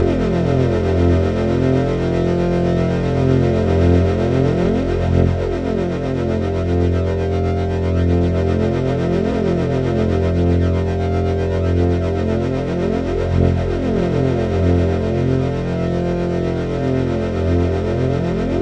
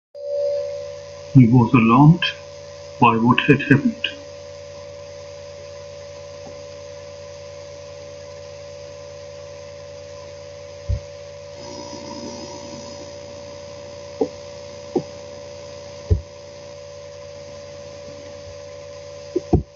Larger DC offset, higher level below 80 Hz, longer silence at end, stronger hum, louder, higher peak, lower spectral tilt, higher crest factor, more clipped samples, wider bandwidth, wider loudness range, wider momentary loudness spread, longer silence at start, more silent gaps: neither; first, -32 dBFS vs -40 dBFS; about the same, 0 s vs 0.1 s; second, none vs 50 Hz at -55 dBFS; about the same, -18 LUFS vs -19 LUFS; about the same, -2 dBFS vs 0 dBFS; first, -8.5 dB/octave vs -7 dB/octave; second, 14 dB vs 22 dB; neither; about the same, 8.2 kHz vs 7.6 kHz; second, 2 LU vs 20 LU; second, 4 LU vs 22 LU; second, 0 s vs 0.15 s; neither